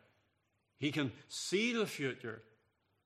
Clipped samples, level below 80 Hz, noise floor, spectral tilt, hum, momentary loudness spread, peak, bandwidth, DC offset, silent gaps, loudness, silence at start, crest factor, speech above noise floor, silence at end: under 0.1%; -84 dBFS; -80 dBFS; -4 dB/octave; none; 13 LU; -20 dBFS; 14.5 kHz; under 0.1%; none; -37 LUFS; 0.8 s; 20 dB; 43 dB; 0.65 s